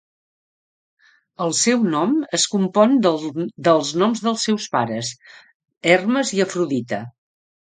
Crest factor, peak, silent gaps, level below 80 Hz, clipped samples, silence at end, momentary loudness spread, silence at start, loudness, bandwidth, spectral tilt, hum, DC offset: 20 dB; 0 dBFS; 5.55-5.60 s, 5.77-5.81 s; -68 dBFS; under 0.1%; 0.55 s; 10 LU; 1.4 s; -19 LUFS; 9.6 kHz; -4 dB/octave; none; under 0.1%